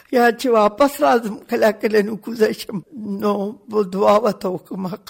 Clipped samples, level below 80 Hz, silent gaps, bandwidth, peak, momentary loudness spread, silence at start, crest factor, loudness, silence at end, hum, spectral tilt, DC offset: under 0.1%; -58 dBFS; none; 17 kHz; -6 dBFS; 12 LU; 0.1 s; 14 dB; -18 LUFS; 0.15 s; none; -5.5 dB/octave; under 0.1%